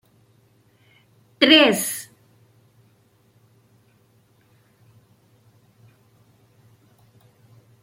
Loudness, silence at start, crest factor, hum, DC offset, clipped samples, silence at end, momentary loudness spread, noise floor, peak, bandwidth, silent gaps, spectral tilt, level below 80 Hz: -16 LUFS; 1.4 s; 26 dB; none; under 0.1%; under 0.1%; 5.8 s; 21 LU; -60 dBFS; -2 dBFS; 16.5 kHz; none; -2.5 dB/octave; -72 dBFS